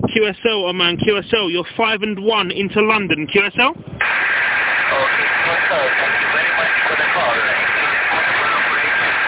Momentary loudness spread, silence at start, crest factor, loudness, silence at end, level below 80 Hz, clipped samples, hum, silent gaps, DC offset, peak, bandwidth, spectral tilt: 3 LU; 0 s; 16 dB; -15 LUFS; 0 s; -50 dBFS; under 0.1%; none; none; under 0.1%; 0 dBFS; 4 kHz; -7.5 dB/octave